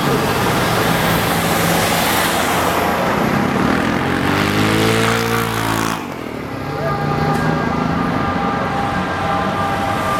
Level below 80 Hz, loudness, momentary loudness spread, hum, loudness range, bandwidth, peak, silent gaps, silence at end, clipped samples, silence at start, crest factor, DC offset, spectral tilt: -38 dBFS; -17 LUFS; 5 LU; none; 3 LU; 16.5 kHz; -2 dBFS; none; 0 s; under 0.1%; 0 s; 16 dB; under 0.1%; -4.5 dB/octave